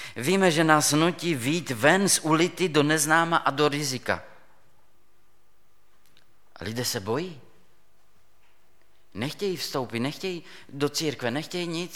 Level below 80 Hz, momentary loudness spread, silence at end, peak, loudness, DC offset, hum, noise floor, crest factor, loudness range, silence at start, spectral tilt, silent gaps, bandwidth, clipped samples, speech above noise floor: -66 dBFS; 14 LU; 0 s; -2 dBFS; -24 LUFS; 0.4%; none; -67 dBFS; 24 dB; 13 LU; 0 s; -3.5 dB/octave; none; 17.5 kHz; under 0.1%; 42 dB